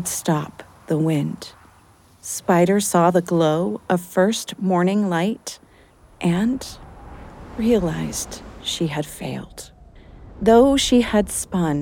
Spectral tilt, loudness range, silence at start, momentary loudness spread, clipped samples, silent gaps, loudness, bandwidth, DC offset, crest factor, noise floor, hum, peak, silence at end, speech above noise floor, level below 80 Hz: -5 dB/octave; 6 LU; 0 s; 19 LU; under 0.1%; none; -20 LUFS; 19 kHz; under 0.1%; 18 dB; -52 dBFS; none; -2 dBFS; 0 s; 32 dB; -44 dBFS